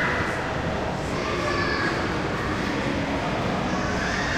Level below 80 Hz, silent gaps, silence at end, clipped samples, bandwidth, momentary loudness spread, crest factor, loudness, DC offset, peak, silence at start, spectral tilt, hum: -40 dBFS; none; 0 s; under 0.1%; 15.5 kHz; 3 LU; 14 dB; -25 LUFS; under 0.1%; -12 dBFS; 0 s; -5 dB/octave; none